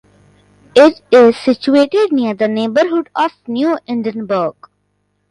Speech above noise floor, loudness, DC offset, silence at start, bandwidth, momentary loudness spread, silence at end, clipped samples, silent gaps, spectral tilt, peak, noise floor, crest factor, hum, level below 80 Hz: 52 dB; -13 LUFS; under 0.1%; 0.75 s; 11 kHz; 9 LU; 0.8 s; under 0.1%; none; -5.5 dB/octave; 0 dBFS; -64 dBFS; 14 dB; 50 Hz at -50 dBFS; -58 dBFS